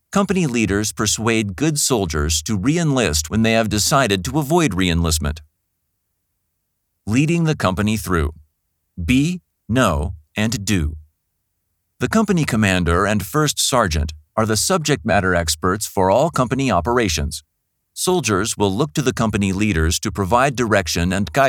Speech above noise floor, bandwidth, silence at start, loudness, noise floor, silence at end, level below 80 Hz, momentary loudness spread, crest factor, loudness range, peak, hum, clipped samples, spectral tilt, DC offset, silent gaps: 55 dB; 19 kHz; 0.1 s; -18 LUFS; -72 dBFS; 0 s; -34 dBFS; 6 LU; 18 dB; 4 LU; -2 dBFS; none; under 0.1%; -4.5 dB/octave; under 0.1%; none